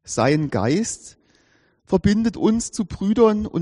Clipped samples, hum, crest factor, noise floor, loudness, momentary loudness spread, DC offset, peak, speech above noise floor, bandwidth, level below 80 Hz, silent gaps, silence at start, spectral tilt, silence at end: under 0.1%; none; 16 dB; -60 dBFS; -20 LUFS; 8 LU; under 0.1%; -4 dBFS; 41 dB; 11 kHz; -44 dBFS; none; 0.05 s; -6 dB/octave; 0 s